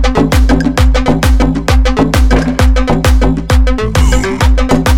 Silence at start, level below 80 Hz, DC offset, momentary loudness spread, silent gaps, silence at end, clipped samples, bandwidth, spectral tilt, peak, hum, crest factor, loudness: 0 s; -10 dBFS; 5%; 2 LU; none; 0 s; 0.3%; 15.5 kHz; -6 dB/octave; 0 dBFS; none; 8 dB; -11 LUFS